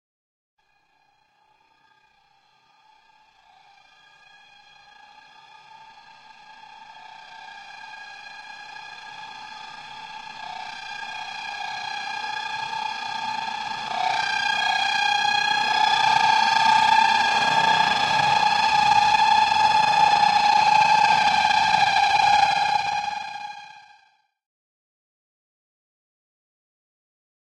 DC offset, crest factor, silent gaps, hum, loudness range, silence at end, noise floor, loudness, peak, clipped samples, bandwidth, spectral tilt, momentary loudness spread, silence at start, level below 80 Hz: under 0.1%; 18 dB; none; none; 21 LU; 3.75 s; -65 dBFS; -20 LUFS; -6 dBFS; under 0.1%; 12 kHz; -1 dB/octave; 21 LU; 5.8 s; -62 dBFS